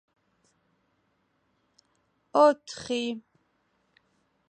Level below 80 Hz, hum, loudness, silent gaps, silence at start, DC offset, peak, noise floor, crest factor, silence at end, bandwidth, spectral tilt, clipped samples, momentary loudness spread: -74 dBFS; none; -26 LUFS; none; 2.35 s; under 0.1%; -8 dBFS; -73 dBFS; 24 dB; 1.3 s; 9.4 kHz; -3.5 dB/octave; under 0.1%; 13 LU